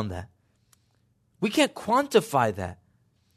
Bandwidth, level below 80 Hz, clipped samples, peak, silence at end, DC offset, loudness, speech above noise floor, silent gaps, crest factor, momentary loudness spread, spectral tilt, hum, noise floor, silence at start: 13.5 kHz; -64 dBFS; under 0.1%; -6 dBFS; 0.65 s; under 0.1%; -25 LUFS; 43 dB; none; 22 dB; 14 LU; -4.5 dB/octave; none; -68 dBFS; 0 s